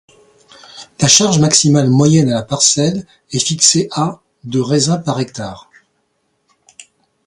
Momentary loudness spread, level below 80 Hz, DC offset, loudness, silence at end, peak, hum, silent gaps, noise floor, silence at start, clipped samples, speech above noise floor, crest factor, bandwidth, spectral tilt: 16 LU; -52 dBFS; under 0.1%; -13 LUFS; 0.45 s; 0 dBFS; none; none; -65 dBFS; 0.75 s; under 0.1%; 52 dB; 16 dB; 16 kHz; -4 dB/octave